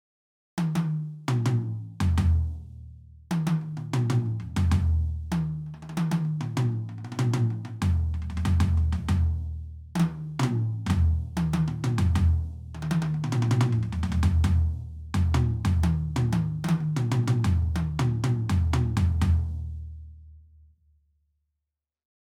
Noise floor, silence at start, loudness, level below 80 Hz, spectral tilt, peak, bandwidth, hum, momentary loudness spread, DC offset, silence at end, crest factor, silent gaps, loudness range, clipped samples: -86 dBFS; 0.55 s; -27 LUFS; -34 dBFS; -7 dB/octave; -12 dBFS; 12 kHz; none; 10 LU; under 0.1%; 1.85 s; 14 dB; none; 3 LU; under 0.1%